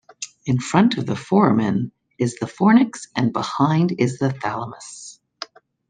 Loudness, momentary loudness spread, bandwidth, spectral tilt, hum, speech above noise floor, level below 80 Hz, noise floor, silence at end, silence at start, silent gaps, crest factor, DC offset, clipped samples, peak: -20 LUFS; 20 LU; 9.6 kHz; -6.5 dB/octave; none; 20 dB; -60 dBFS; -39 dBFS; 0.45 s; 0.2 s; none; 18 dB; under 0.1%; under 0.1%; -2 dBFS